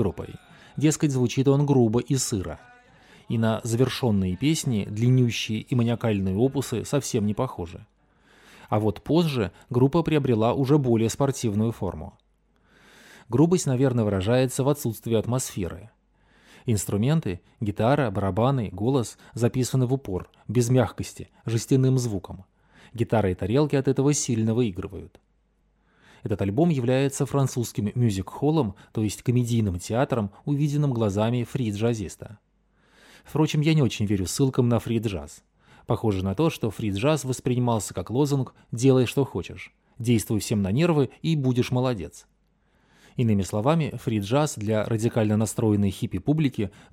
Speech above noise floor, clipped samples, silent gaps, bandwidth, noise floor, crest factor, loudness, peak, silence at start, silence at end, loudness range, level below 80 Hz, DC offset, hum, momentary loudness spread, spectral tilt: 42 dB; under 0.1%; none; 16 kHz; -66 dBFS; 18 dB; -24 LUFS; -8 dBFS; 0 s; 0.25 s; 3 LU; -52 dBFS; under 0.1%; none; 11 LU; -6.5 dB/octave